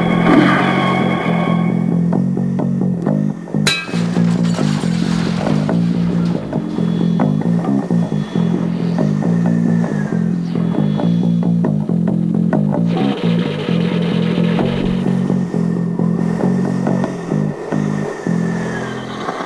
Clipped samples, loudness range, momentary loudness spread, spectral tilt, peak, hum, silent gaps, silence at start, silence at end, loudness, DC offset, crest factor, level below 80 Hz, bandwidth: under 0.1%; 2 LU; 4 LU; -7 dB/octave; 0 dBFS; none; none; 0 s; 0 s; -16 LUFS; under 0.1%; 16 dB; -44 dBFS; 11 kHz